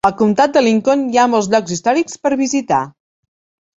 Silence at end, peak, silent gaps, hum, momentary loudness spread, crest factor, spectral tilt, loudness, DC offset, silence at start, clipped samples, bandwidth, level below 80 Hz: 0.9 s; 0 dBFS; none; none; 6 LU; 14 dB; -4.5 dB/octave; -15 LUFS; under 0.1%; 0.05 s; under 0.1%; 8 kHz; -54 dBFS